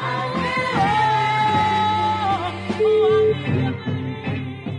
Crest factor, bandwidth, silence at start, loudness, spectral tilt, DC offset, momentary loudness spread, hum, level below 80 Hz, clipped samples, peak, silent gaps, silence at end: 12 dB; 10.5 kHz; 0 s; -20 LUFS; -6.5 dB/octave; under 0.1%; 9 LU; none; -52 dBFS; under 0.1%; -8 dBFS; none; 0 s